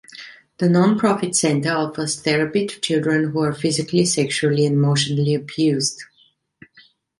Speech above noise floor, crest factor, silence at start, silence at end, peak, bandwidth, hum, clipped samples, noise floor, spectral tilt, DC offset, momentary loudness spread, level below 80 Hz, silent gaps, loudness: 40 dB; 16 dB; 0.1 s; 1.15 s; -4 dBFS; 11.5 kHz; none; under 0.1%; -59 dBFS; -5 dB/octave; under 0.1%; 6 LU; -60 dBFS; none; -19 LUFS